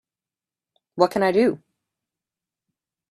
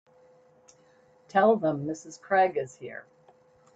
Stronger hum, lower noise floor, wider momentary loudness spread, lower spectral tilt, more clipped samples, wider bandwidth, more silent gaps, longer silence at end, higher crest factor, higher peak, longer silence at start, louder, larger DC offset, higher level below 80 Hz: neither; first, under -90 dBFS vs -61 dBFS; about the same, 19 LU vs 19 LU; about the same, -6 dB/octave vs -6 dB/octave; neither; first, 14.5 kHz vs 8.2 kHz; neither; first, 1.55 s vs 0.75 s; about the same, 22 dB vs 20 dB; first, -2 dBFS vs -10 dBFS; second, 0.95 s vs 1.35 s; first, -21 LUFS vs -26 LUFS; neither; first, -66 dBFS vs -74 dBFS